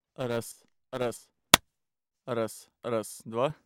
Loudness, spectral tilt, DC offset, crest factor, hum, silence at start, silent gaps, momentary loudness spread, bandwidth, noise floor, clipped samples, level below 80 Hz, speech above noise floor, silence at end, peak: -29 LUFS; -2.5 dB/octave; under 0.1%; 32 dB; none; 0.2 s; none; 20 LU; 19 kHz; -85 dBFS; under 0.1%; -62 dBFS; 52 dB; 0.1 s; 0 dBFS